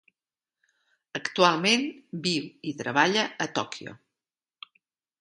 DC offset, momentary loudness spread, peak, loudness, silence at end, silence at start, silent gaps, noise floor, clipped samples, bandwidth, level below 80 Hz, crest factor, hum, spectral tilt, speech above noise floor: under 0.1%; 14 LU; -6 dBFS; -26 LUFS; 1.25 s; 1.15 s; none; under -90 dBFS; under 0.1%; 11.5 kHz; -74 dBFS; 24 dB; none; -3.5 dB/octave; over 63 dB